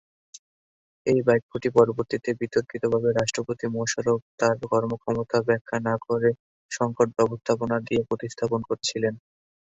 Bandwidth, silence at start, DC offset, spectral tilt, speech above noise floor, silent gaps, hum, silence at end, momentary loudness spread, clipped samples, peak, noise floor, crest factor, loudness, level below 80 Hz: 8.2 kHz; 0.35 s; under 0.1%; -5 dB/octave; over 66 dB; 0.39-1.05 s, 1.42-1.49 s, 4.22-4.38 s, 5.61-5.65 s, 6.39-6.69 s; none; 0.55 s; 7 LU; under 0.1%; -4 dBFS; under -90 dBFS; 22 dB; -25 LUFS; -58 dBFS